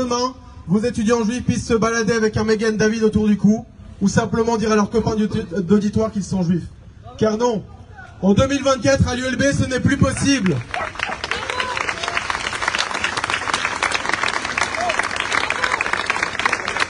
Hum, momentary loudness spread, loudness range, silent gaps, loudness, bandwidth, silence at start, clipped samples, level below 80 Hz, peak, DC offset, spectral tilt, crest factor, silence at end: none; 6 LU; 3 LU; none; -19 LUFS; 10.5 kHz; 0 s; under 0.1%; -40 dBFS; 0 dBFS; under 0.1%; -5 dB/octave; 20 dB; 0 s